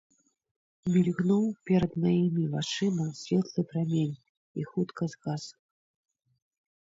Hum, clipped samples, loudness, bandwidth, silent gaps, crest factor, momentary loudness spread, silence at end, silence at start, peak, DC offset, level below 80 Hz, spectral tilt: none; under 0.1%; -29 LUFS; 7.8 kHz; 4.29-4.55 s; 16 dB; 11 LU; 1.35 s; 0.85 s; -14 dBFS; under 0.1%; -62 dBFS; -7 dB/octave